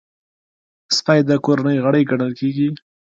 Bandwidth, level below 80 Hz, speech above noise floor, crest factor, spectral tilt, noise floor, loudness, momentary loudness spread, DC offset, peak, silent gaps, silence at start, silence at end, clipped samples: 7.8 kHz; -62 dBFS; over 74 dB; 18 dB; -5.5 dB/octave; under -90 dBFS; -17 LUFS; 6 LU; under 0.1%; 0 dBFS; none; 0.9 s; 0.4 s; under 0.1%